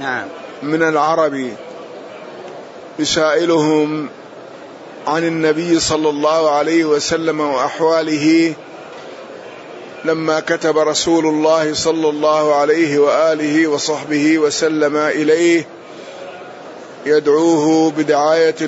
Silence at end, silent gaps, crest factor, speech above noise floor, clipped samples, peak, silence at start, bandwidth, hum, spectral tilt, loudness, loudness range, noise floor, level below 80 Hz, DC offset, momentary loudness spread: 0 s; none; 14 dB; 20 dB; under 0.1%; -2 dBFS; 0 s; 8 kHz; none; -4 dB/octave; -15 LUFS; 4 LU; -35 dBFS; -56 dBFS; under 0.1%; 20 LU